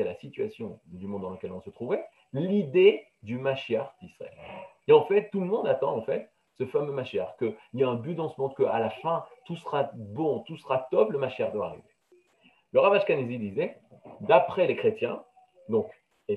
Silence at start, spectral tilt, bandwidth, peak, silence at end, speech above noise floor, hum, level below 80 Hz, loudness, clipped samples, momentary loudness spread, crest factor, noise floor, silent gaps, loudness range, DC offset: 0 s; -8 dB/octave; 5.2 kHz; -4 dBFS; 0 s; 37 dB; none; -74 dBFS; -28 LUFS; under 0.1%; 18 LU; 24 dB; -64 dBFS; none; 4 LU; under 0.1%